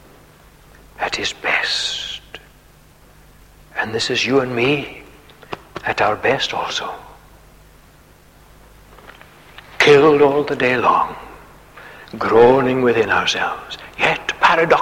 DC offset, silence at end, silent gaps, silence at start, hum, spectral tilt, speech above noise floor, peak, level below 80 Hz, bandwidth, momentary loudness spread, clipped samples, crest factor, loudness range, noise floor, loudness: under 0.1%; 0 s; none; 1 s; 50 Hz at -50 dBFS; -4 dB/octave; 32 dB; -2 dBFS; -48 dBFS; 16 kHz; 20 LU; under 0.1%; 18 dB; 8 LU; -48 dBFS; -16 LUFS